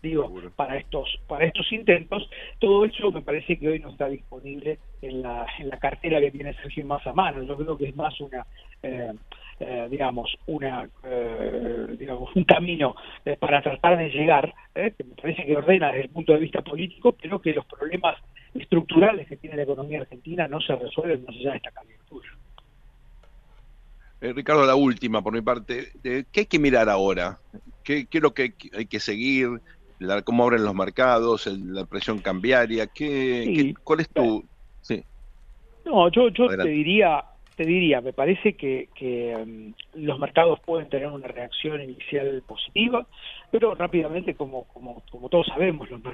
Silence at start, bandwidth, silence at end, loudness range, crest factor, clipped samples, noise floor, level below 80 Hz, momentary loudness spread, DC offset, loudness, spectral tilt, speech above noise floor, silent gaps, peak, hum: 0.05 s; 7.4 kHz; 0 s; 8 LU; 24 dB; under 0.1%; -52 dBFS; -48 dBFS; 15 LU; under 0.1%; -24 LUFS; -6.5 dB/octave; 28 dB; none; 0 dBFS; none